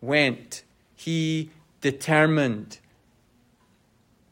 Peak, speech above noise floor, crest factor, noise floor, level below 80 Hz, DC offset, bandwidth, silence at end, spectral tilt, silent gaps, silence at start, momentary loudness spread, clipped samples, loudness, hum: -6 dBFS; 39 dB; 20 dB; -63 dBFS; -68 dBFS; under 0.1%; 16 kHz; 1.55 s; -5.5 dB/octave; none; 0 s; 20 LU; under 0.1%; -24 LUFS; none